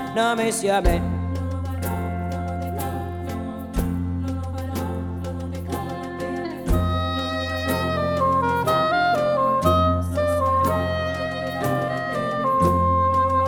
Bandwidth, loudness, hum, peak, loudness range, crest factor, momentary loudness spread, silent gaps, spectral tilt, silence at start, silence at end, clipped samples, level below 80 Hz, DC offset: 20 kHz; -23 LUFS; none; -4 dBFS; 8 LU; 18 dB; 10 LU; none; -6 dB/octave; 0 s; 0 s; under 0.1%; -34 dBFS; under 0.1%